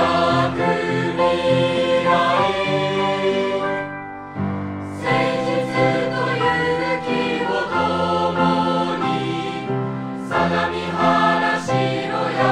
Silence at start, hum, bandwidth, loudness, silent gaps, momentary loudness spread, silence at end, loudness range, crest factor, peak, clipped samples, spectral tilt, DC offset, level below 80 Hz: 0 s; none; 11 kHz; -20 LUFS; none; 8 LU; 0 s; 3 LU; 16 dB; -4 dBFS; under 0.1%; -6 dB/octave; under 0.1%; -52 dBFS